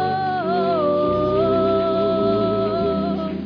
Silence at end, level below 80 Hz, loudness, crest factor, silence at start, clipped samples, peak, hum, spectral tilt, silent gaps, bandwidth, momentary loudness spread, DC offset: 0 s; -46 dBFS; -20 LUFS; 10 dB; 0 s; under 0.1%; -8 dBFS; none; -9 dB/octave; none; 5.4 kHz; 3 LU; under 0.1%